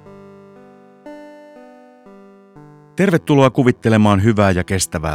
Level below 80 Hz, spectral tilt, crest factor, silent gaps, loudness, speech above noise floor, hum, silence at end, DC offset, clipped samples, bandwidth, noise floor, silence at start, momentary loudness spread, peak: -46 dBFS; -6 dB/octave; 16 dB; none; -15 LUFS; 30 dB; none; 0 s; under 0.1%; under 0.1%; 15.5 kHz; -44 dBFS; 1.05 s; 21 LU; 0 dBFS